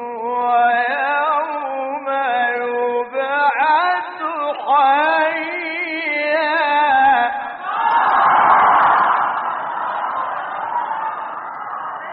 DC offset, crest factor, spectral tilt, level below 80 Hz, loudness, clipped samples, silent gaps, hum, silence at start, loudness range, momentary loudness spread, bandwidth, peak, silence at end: under 0.1%; 16 dB; 0.5 dB/octave; -64 dBFS; -17 LUFS; under 0.1%; none; none; 0 s; 4 LU; 11 LU; 4.8 kHz; -2 dBFS; 0 s